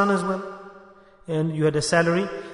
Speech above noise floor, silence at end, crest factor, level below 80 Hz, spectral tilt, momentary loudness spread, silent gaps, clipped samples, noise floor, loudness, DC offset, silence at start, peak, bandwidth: 28 dB; 0 s; 16 dB; -56 dBFS; -5.5 dB/octave; 13 LU; none; under 0.1%; -50 dBFS; -23 LUFS; under 0.1%; 0 s; -8 dBFS; 11 kHz